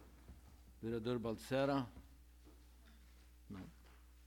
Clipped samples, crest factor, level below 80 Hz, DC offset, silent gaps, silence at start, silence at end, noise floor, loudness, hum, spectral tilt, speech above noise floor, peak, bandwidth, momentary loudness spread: under 0.1%; 20 dB; -62 dBFS; under 0.1%; none; 0 s; 0 s; -63 dBFS; -42 LUFS; 60 Hz at -60 dBFS; -6.5 dB/octave; 23 dB; -26 dBFS; 19 kHz; 25 LU